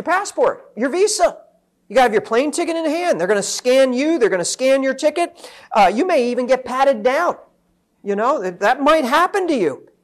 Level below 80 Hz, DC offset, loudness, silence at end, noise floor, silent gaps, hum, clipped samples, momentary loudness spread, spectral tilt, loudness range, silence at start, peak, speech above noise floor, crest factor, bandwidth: -54 dBFS; under 0.1%; -17 LUFS; 0.25 s; -63 dBFS; none; none; under 0.1%; 7 LU; -3 dB/octave; 2 LU; 0 s; -6 dBFS; 46 dB; 12 dB; 13.5 kHz